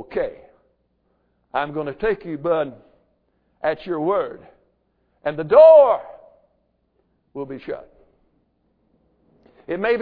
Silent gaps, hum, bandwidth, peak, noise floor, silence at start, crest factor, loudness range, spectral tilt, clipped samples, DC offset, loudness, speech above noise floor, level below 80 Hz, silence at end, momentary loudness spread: none; none; 4.8 kHz; -2 dBFS; -67 dBFS; 0 s; 20 dB; 21 LU; -9.5 dB/octave; under 0.1%; under 0.1%; -19 LUFS; 49 dB; -54 dBFS; 0 s; 22 LU